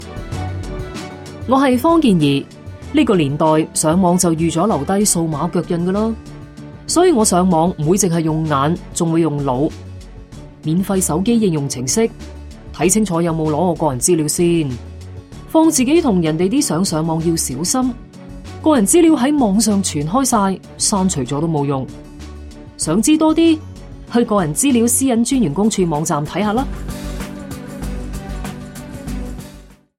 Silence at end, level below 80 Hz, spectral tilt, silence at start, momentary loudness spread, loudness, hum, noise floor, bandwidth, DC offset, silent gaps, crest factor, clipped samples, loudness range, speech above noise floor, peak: 0.35 s; -36 dBFS; -5 dB/octave; 0 s; 20 LU; -16 LUFS; none; -41 dBFS; 16.5 kHz; under 0.1%; none; 16 dB; under 0.1%; 4 LU; 26 dB; 0 dBFS